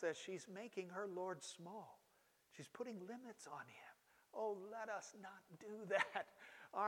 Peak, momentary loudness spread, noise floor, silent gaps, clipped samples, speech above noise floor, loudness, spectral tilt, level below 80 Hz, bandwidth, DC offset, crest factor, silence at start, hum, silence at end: -26 dBFS; 16 LU; -77 dBFS; none; under 0.1%; 29 dB; -49 LUFS; -3.5 dB/octave; under -90 dBFS; 18 kHz; under 0.1%; 24 dB; 0 s; none; 0 s